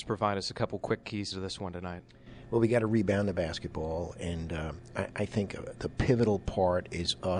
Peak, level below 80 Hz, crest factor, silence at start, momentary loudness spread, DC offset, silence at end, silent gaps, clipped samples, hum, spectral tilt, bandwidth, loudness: -12 dBFS; -48 dBFS; 18 dB; 0 s; 11 LU; under 0.1%; 0 s; none; under 0.1%; none; -6 dB/octave; 10.5 kHz; -32 LUFS